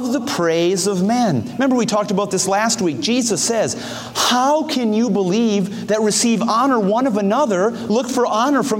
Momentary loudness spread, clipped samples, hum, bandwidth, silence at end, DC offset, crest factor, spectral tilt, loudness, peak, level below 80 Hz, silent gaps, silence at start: 4 LU; under 0.1%; none; 16.5 kHz; 0 s; under 0.1%; 14 dB; -4 dB/octave; -17 LUFS; -4 dBFS; -60 dBFS; none; 0 s